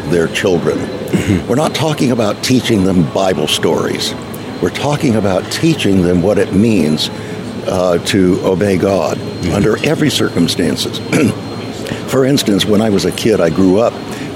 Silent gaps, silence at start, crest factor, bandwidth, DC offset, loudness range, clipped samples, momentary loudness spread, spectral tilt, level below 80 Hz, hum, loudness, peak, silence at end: none; 0 s; 12 dB; 16.5 kHz; under 0.1%; 1 LU; under 0.1%; 7 LU; -5.5 dB/octave; -40 dBFS; none; -14 LUFS; -2 dBFS; 0 s